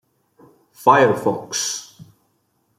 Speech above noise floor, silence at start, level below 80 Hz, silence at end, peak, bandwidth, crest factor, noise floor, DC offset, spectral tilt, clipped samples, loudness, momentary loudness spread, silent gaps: 49 dB; 0.8 s; -68 dBFS; 0.75 s; -2 dBFS; 15.5 kHz; 20 dB; -66 dBFS; under 0.1%; -3.5 dB/octave; under 0.1%; -18 LUFS; 10 LU; none